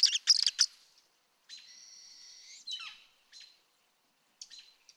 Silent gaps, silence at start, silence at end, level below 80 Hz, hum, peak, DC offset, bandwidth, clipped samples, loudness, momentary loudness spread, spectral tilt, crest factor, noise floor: none; 0 s; 0.35 s; under -90 dBFS; none; -12 dBFS; under 0.1%; 16.5 kHz; under 0.1%; -28 LUFS; 27 LU; 7 dB/octave; 24 dB; -73 dBFS